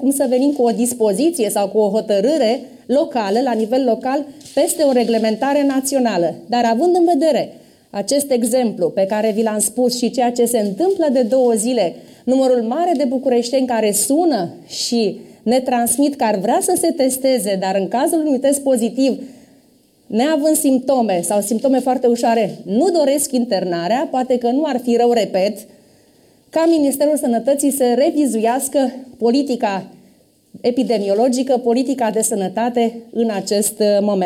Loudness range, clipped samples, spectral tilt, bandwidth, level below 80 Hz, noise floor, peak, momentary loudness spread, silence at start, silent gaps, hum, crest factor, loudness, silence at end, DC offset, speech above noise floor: 2 LU; under 0.1%; -4 dB/octave; 16.5 kHz; -64 dBFS; -53 dBFS; -6 dBFS; 5 LU; 0 s; none; none; 12 dB; -17 LUFS; 0 s; under 0.1%; 37 dB